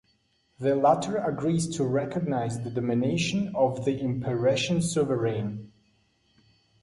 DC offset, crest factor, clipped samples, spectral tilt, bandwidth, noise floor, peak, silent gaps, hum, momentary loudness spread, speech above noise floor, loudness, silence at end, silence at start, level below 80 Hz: under 0.1%; 18 dB; under 0.1%; -6 dB/octave; 11.5 kHz; -69 dBFS; -8 dBFS; none; none; 7 LU; 43 dB; -27 LUFS; 1.15 s; 0.6 s; -60 dBFS